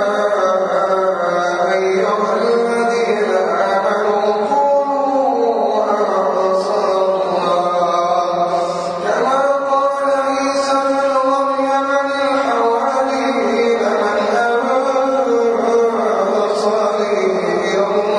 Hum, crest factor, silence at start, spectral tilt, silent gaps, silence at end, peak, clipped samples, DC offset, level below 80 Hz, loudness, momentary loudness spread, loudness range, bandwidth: none; 12 dB; 0 s; -4.5 dB/octave; none; 0 s; -4 dBFS; under 0.1%; under 0.1%; -60 dBFS; -16 LUFS; 2 LU; 1 LU; 10.5 kHz